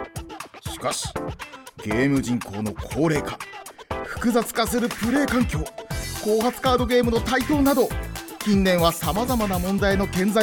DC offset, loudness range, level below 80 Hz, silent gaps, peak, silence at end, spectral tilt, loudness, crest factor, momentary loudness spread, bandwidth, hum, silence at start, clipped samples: under 0.1%; 5 LU; -38 dBFS; none; -6 dBFS; 0 s; -5 dB/octave; -23 LUFS; 16 dB; 15 LU; 19 kHz; none; 0 s; under 0.1%